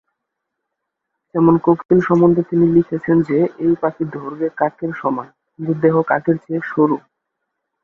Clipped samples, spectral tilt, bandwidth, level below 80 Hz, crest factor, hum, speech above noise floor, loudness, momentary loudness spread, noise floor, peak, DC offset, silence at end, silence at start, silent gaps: under 0.1%; -10.5 dB/octave; 4 kHz; -54 dBFS; 16 dB; none; 62 dB; -17 LUFS; 11 LU; -78 dBFS; -2 dBFS; under 0.1%; 0.85 s; 1.35 s; 1.85-1.89 s